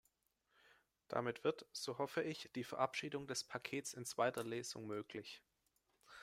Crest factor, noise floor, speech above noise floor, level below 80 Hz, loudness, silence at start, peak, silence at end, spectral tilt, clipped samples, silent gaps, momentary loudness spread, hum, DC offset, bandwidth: 24 dB; -83 dBFS; 39 dB; -84 dBFS; -44 LUFS; 1.1 s; -22 dBFS; 0 s; -3.5 dB/octave; under 0.1%; none; 9 LU; none; under 0.1%; 16 kHz